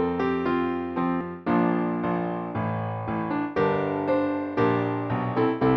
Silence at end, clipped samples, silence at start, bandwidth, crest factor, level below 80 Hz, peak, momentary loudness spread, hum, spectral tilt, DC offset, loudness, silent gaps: 0 s; under 0.1%; 0 s; 6 kHz; 16 dB; -56 dBFS; -8 dBFS; 6 LU; none; -9.5 dB/octave; under 0.1%; -26 LUFS; none